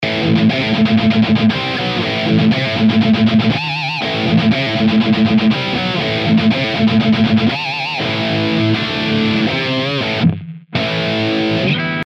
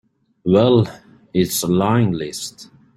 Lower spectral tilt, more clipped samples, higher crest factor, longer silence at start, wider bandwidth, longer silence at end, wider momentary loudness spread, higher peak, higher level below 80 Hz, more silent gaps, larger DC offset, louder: about the same, -6.5 dB/octave vs -6 dB/octave; neither; about the same, 12 dB vs 16 dB; second, 0 s vs 0.45 s; second, 7.2 kHz vs 16 kHz; second, 0 s vs 0.35 s; second, 5 LU vs 13 LU; about the same, -2 dBFS vs -2 dBFS; first, -46 dBFS vs -52 dBFS; neither; neither; first, -15 LUFS vs -18 LUFS